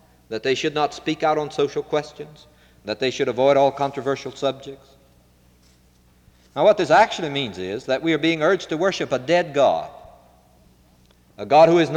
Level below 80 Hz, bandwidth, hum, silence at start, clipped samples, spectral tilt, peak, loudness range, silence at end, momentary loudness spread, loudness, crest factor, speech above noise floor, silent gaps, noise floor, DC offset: -58 dBFS; 10.5 kHz; none; 0.3 s; under 0.1%; -5 dB/octave; -4 dBFS; 4 LU; 0 s; 18 LU; -20 LUFS; 18 dB; 36 dB; none; -56 dBFS; under 0.1%